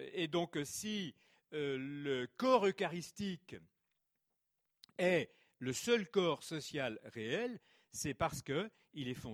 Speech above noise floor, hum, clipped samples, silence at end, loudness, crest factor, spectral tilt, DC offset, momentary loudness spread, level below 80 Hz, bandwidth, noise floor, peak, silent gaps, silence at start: 48 dB; none; under 0.1%; 0 s; -38 LUFS; 22 dB; -4.5 dB/octave; under 0.1%; 15 LU; -70 dBFS; 19.5 kHz; -86 dBFS; -18 dBFS; none; 0 s